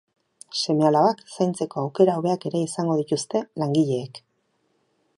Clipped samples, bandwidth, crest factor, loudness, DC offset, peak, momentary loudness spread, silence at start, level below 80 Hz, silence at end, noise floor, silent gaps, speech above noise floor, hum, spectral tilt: under 0.1%; 11.5 kHz; 20 dB; -23 LUFS; under 0.1%; -4 dBFS; 8 LU; 0.5 s; -72 dBFS; 1 s; -70 dBFS; none; 47 dB; none; -6 dB/octave